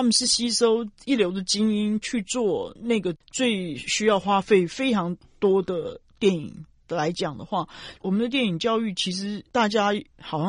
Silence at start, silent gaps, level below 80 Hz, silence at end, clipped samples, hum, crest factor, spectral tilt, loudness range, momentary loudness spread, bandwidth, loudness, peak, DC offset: 0 s; none; -58 dBFS; 0 s; under 0.1%; none; 18 dB; -4 dB/octave; 3 LU; 10 LU; 11 kHz; -24 LUFS; -6 dBFS; under 0.1%